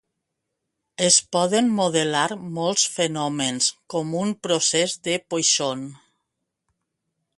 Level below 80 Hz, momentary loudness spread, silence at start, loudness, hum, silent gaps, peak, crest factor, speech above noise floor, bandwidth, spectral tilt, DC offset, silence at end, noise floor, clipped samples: -68 dBFS; 10 LU; 1 s; -21 LUFS; none; none; -4 dBFS; 20 dB; 58 dB; 11.5 kHz; -2.5 dB/octave; under 0.1%; 1.4 s; -80 dBFS; under 0.1%